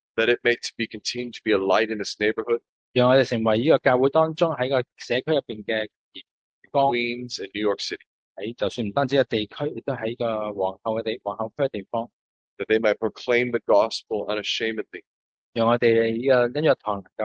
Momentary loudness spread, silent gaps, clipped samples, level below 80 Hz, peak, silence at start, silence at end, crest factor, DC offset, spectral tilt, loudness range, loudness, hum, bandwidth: 11 LU; 2.69-2.94 s, 5.96-6.12 s, 6.31-6.62 s, 8.07-8.35 s, 12.13-12.57 s, 15.07-15.53 s, 17.12-17.16 s; under 0.1%; -66 dBFS; -4 dBFS; 0.15 s; 0 s; 18 dB; under 0.1%; -5 dB/octave; 5 LU; -24 LUFS; none; 9 kHz